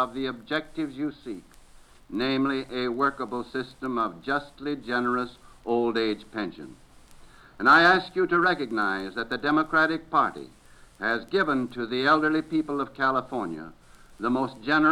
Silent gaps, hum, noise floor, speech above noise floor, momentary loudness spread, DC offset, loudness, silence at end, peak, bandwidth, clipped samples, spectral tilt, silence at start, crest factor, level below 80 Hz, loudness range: none; none; -52 dBFS; 26 dB; 12 LU; under 0.1%; -26 LUFS; 0 s; -8 dBFS; 12.5 kHz; under 0.1%; -5.5 dB/octave; 0 s; 20 dB; -56 dBFS; 7 LU